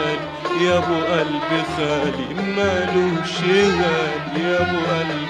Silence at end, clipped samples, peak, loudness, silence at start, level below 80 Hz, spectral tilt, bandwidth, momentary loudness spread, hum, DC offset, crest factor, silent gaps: 0 s; under 0.1%; -4 dBFS; -20 LUFS; 0 s; -48 dBFS; -5.5 dB/octave; 10.5 kHz; 6 LU; none; under 0.1%; 14 dB; none